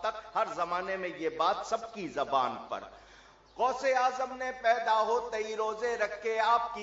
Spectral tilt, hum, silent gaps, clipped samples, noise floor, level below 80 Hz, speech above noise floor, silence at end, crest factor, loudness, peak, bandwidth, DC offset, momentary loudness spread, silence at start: -3 dB/octave; none; none; under 0.1%; -57 dBFS; -66 dBFS; 26 dB; 0 s; 18 dB; -31 LUFS; -14 dBFS; 7.8 kHz; under 0.1%; 8 LU; 0 s